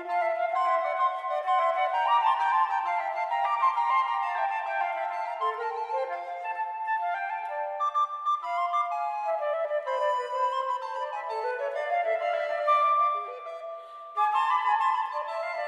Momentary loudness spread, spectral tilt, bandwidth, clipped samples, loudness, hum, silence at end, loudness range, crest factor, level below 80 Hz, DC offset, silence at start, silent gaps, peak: 8 LU; 0.5 dB/octave; 10.5 kHz; under 0.1%; -28 LUFS; none; 0 s; 4 LU; 14 dB; under -90 dBFS; under 0.1%; 0 s; none; -14 dBFS